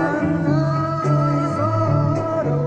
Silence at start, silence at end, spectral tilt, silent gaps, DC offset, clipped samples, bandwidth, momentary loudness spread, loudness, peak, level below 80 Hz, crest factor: 0 s; 0 s; -8.5 dB/octave; none; under 0.1%; under 0.1%; 8.2 kHz; 2 LU; -19 LUFS; -6 dBFS; -46 dBFS; 12 dB